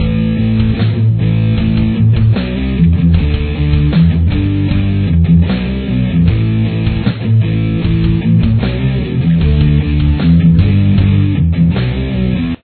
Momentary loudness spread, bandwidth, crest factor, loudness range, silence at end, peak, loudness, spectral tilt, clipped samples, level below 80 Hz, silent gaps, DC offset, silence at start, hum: 5 LU; 4.5 kHz; 10 dB; 2 LU; 0.1 s; 0 dBFS; -12 LUFS; -12 dB/octave; under 0.1%; -20 dBFS; none; under 0.1%; 0 s; none